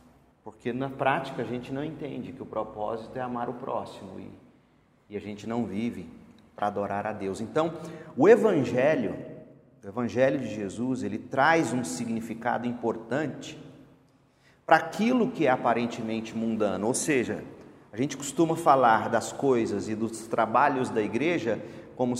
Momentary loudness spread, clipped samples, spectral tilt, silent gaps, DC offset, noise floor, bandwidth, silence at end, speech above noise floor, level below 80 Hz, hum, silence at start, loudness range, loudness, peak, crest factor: 17 LU; under 0.1%; -5.5 dB/octave; none; under 0.1%; -63 dBFS; 15 kHz; 0 s; 36 dB; -66 dBFS; none; 0.45 s; 10 LU; -27 LUFS; -4 dBFS; 24 dB